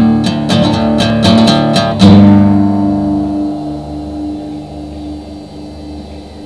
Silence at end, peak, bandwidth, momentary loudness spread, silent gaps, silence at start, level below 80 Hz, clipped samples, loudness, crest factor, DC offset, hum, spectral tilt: 0 s; 0 dBFS; 11 kHz; 21 LU; none; 0 s; -32 dBFS; 1%; -10 LUFS; 10 dB; 0.4%; 50 Hz at -20 dBFS; -6.5 dB/octave